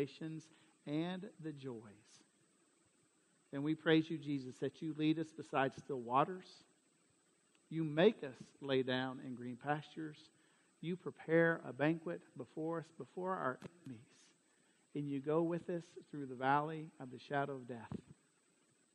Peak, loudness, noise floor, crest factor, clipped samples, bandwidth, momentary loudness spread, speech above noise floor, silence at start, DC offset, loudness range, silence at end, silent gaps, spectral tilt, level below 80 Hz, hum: -18 dBFS; -40 LUFS; -75 dBFS; 24 dB; under 0.1%; 9.4 kHz; 17 LU; 35 dB; 0 s; under 0.1%; 5 LU; 0.8 s; none; -7 dB/octave; -84 dBFS; none